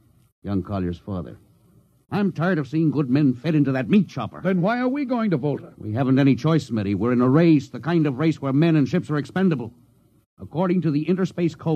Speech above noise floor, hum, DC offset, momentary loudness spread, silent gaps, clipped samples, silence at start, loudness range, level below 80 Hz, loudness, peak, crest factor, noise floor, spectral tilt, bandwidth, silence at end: 36 dB; none; under 0.1%; 10 LU; 10.26-10.37 s; under 0.1%; 0.45 s; 4 LU; -58 dBFS; -22 LUFS; -6 dBFS; 16 dB; -57 dBFS; -8.5 dB/octave; 8.6 kHz; 0 s